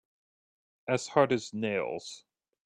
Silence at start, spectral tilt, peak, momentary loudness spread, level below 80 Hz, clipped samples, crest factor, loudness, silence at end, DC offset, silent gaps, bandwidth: 0.85 s; -5 dB/octave; -10 dBFS; 18 LU; -72 dBFS; under 0.1%; 24 dB; -30 LUFS; 0.45 s; under 0.1%; none; 10 kHz